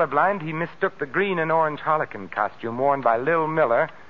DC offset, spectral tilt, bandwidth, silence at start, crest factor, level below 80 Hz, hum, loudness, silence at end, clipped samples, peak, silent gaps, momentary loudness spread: 0.6%; -8 dB/octave; 6.6 kHz; 0 s; 16 dB; -64 dBFS; none; -23 LUFS; 0.05 s; under 0.1%; -6 dBFS; none; 6 LU